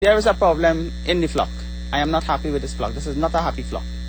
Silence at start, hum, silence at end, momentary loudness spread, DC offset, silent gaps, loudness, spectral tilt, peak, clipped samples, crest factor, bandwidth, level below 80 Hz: 0 s; none; 0 s; 10 LU; under 0.1%; none; -21 LUFS; -5.5 dB/octave; -4 dBFS; under 0.1%; 16 dB; over 20 kHz; -30 dBFS